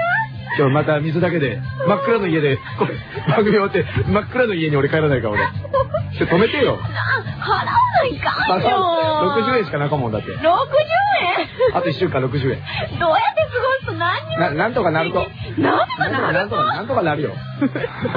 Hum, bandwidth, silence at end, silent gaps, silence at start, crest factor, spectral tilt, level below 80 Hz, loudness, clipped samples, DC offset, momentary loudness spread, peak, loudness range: none; 5.2 kHz; 0 s; none; 0 s; 14 dB; -9 dB/octave; -44 dBFS; -18 LUFS; under 0.1%; under 0.1%; 6 LU; -4 dBFS; 2 LU